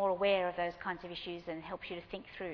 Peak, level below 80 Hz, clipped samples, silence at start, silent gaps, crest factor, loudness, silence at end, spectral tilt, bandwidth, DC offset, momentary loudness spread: -18 dBFS; -64 dBFS; under 0.1%; 0 s; none; 18 dB; -37 LUFS; 0 s; -6.5 dB/octave; 5.4 kHz; under 0.1%; 12 LU